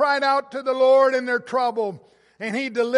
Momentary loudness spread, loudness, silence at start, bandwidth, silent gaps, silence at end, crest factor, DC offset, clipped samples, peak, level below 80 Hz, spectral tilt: 12 LU; -21 LUFS; 0 s; 11 kHz; none; 0 s; 16 dB; under 0.1%; under 0.1%; -6 dBFS; -78 dBFS; -4.5 dB/octave